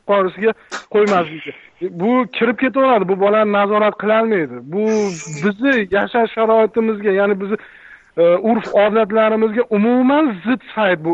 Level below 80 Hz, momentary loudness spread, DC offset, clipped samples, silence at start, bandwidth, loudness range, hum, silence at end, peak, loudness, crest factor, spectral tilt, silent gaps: -60 dBFS; 8 LU; under 0.1%; under 0.1%; 0.05 s; 8 kHz; 1 LU; none; 0 s; -4 dBFS; -16 LUFS; 12 dB; -6 dB/octave; none